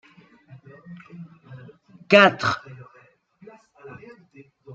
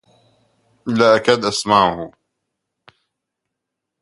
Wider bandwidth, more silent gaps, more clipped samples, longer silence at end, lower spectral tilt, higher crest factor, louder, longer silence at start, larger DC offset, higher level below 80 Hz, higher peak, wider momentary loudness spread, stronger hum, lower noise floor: second, 7.8 kHz vs 11.5 kHz; neither; neither; second, 0 s vs 1.95 s; about the same, -5 dB/octave vs -4 dB/octave; about the same, 24 dB vs 20 dB; second, -18 LUFS vs -15 LUFS; about the same, 0.9 s vs 0.85 s; neither; second, -66 dBFS vs -56 dBFS; about the same, -2 dBFS vs 0 dBFS; first, 30 LU vs 18 LU; neither; second, -57 dBFS vs -80 dBFS